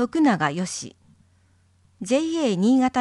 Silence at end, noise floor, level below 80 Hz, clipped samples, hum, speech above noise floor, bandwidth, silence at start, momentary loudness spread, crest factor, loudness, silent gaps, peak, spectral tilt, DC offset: 0 s; -60 dBFS; -64 dBFS; under 0.1%; none; 39 dB; 11.5 kHz; 0 s; 15 LU; 16 dB; -22 LUFS; none; -8 dBFS; -5 dB/octave; under 0.1%